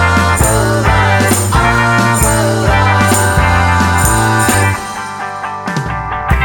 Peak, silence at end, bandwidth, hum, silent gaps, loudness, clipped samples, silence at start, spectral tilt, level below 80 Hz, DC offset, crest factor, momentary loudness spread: 0 dBFS; 0 s; 18 kHz; none; none; -11 LUFS; under 0.1%; 0 s; -4.5 dB/octave; -22 dBFS; under 0.1%; 12 dB; 9 LU